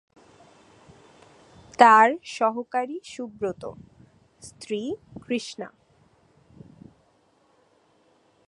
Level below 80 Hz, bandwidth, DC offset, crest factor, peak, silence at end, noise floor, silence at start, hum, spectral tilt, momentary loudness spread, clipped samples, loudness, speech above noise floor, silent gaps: -66 dBFS; 11 kHz; under 0.1%; 26 dB; 0 dBFS; 2.8 s; -63 dBFS; 1.8 s; none; -4 dB/octave; 26 LU; under 0.1%; -22 LUFS; 40 dB; none